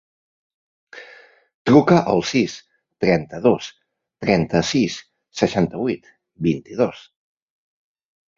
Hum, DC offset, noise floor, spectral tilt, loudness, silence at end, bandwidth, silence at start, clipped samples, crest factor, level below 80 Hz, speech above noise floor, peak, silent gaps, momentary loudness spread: none; under 0.1%; -48 dBFS; -6 dB/octave; -20 LUFS; 1.35 s; 7.6 kHz; 0.95 s; under 0.1%; 20 dB; -52 dBFS; 30 dB; -2 dBFS; 1.54-1.65 s; 19 LU